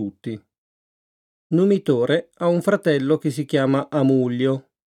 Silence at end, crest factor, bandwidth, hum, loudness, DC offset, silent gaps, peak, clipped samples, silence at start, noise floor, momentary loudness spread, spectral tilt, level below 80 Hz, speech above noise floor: 0.3 s; 16 dB; 13.5 kHz; none; -20 LUFS; under 0.1%; 0.58-1.50 s; -6 dBFS; under 0.1%; 0 s; under -90 dBFS; 11 LU; -7.5 dB/octave; -72 dBFS; over 70 dB